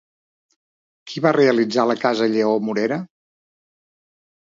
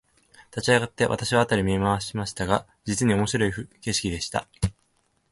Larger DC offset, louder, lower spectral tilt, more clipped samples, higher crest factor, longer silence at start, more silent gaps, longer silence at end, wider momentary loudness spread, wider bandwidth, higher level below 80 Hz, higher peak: neither; first, -19 LUFS vs -25 LUFS; first, -6 dB/octave vs -4.5 dB/octave; neither; about the same, 20 dB vs 22 dB; first, 1.05 s vs 0.55 s; neither; first, 1.35 s vs 0.6 s; about the same, 11 LU vs 9 LU; second, 7.6 kHz vs 11.5 kHz; second, -74 dBFS vs -44 dBFS; about the same, -2 dBFS vs -4 dBFS